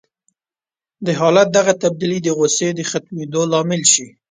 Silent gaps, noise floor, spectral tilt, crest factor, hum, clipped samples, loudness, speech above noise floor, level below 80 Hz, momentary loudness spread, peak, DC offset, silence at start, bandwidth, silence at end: none; under -90 dBFS; -3.5 dB/octave; 18 dB; none; under 0.1%; -16 LUFS; over 74 dB; -62 dBFS; 10 LU; 0 dBFS; under 0.1%; 1 s; 10 kHz; 0.25 s